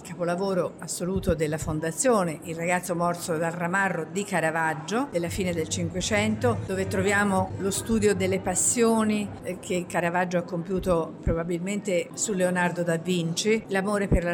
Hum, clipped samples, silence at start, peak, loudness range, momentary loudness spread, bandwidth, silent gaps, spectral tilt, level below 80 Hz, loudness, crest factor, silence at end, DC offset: none; under 0.1%; 0 s; -10 dBFS; 3 LU; 6 LU; 17 kHz; none; -4.5 dB/octave; -44 dBFS; -26 LUFS; 14 dB; 0 s; under 0.1%